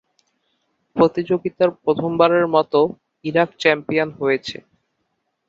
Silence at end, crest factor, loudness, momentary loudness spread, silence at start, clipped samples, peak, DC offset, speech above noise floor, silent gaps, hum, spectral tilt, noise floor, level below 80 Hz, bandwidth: 0.95 s; 18 dB; -19 LUFS; 8 LU; 0.95 s; under 0.1%; -2 dBFS; under 0.1%; 54 dB; none; none; -6.5 dB/octave; -72 dBFS; -60 dBFS; 7.8 kHz